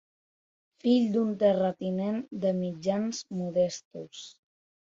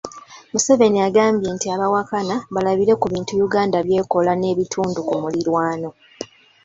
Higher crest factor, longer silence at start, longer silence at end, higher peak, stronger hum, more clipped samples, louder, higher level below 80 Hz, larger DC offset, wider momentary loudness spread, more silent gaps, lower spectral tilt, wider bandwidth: about the same, 16 dB vs 18 dB; first, 0.85 s vs 0.05 s; first, 0.55 s vs 0.4 s; second, -12 dBFS vs -2 dBFS; neither; neither; second, -28 LUFS vs -19 LUFS; second, -70 dBFS vs -56 dBFS; neither; first, 17 LU vs 13 LU; first, 3.85-3.91 s vs none; first, -6.5 dB/octave vs -5 dB/octave; about the same, 7.8 kHz vs 8 kHz